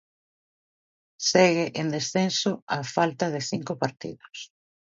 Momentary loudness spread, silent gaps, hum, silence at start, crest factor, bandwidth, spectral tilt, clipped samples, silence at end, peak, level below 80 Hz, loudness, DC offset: 20 LU; 2.62-2.67 s; none; 1.2 s; 22 dB; 7.8 kHz; -4 dB/octave; under 0.1%; 0.45 s; -6 dBFS; -70 dBFS; -25 LUFS; under 0.1%